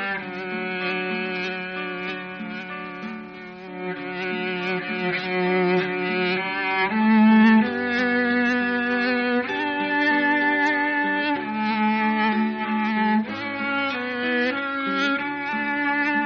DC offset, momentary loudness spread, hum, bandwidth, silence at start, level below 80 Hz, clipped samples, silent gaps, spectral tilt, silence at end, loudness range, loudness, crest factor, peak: under 0.1%; 12 LU; none; 6.6 kHz; 0 s; -64 dBFS; under 0.1%; none; -3 dB/octave; 0 s; 9 LU; -22 LUFS; 14 dB; -8 dBFS